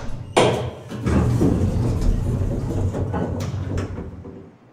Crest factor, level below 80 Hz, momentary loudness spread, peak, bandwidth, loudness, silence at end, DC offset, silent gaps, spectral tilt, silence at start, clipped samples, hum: 20 dB; -30 dBFS; 14 LU; 0 dBFS; 14 kHz; -22 LUFS; 0.2 s; under 0.1%; none; -6.5 dB/octave; 0 s; under 0.1%; none